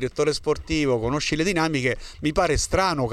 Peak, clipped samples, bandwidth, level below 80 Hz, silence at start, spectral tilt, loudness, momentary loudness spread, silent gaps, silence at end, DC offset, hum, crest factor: -8 dBFS; under 0.1%; 13.5 kHz; -36 dBFS; 0 s; -4.5 dB/octave; -23 LUFS; 4 LU; none; 0 s; under 0.1%; none; 14 dB